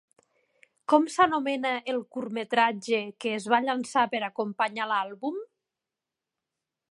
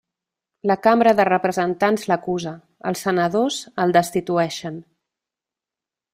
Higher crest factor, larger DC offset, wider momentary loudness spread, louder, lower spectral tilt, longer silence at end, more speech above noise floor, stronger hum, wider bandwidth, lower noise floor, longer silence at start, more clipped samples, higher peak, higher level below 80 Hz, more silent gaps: about the same, 22 dB vs 20 dB; neither; second, 10 LU vs 14 LU; second, -27 LUFS vs -20 LUFS; about the same, -4 dB/octave vs -5 dB/octave; first, 1.45 s vs 1.3 s; second, 62 dB vs 69 dB; neither; second, 11.5 kHz vs 16 kHz; about the same, -88 dBFS vs -89 dBFS; first, 0.9 s vs 0.65 s; neither; second, -6 dBFS vs -2 dBFS; second, -76 dBFS vs -62 dBFS; neither